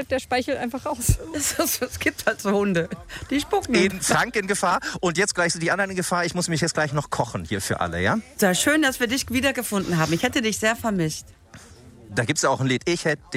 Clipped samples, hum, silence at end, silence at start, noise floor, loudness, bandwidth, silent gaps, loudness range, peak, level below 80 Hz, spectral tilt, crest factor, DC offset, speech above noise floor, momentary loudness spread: under 0.1%; none; 0 s; 0 s; -46 dBFS; -23 LUFS; 16 kHz; none; 2 LU; -6 dBFS; -42 dBFS; -4 dB/octave; 18 dB; under 0.1%; 23 dB; 7 LU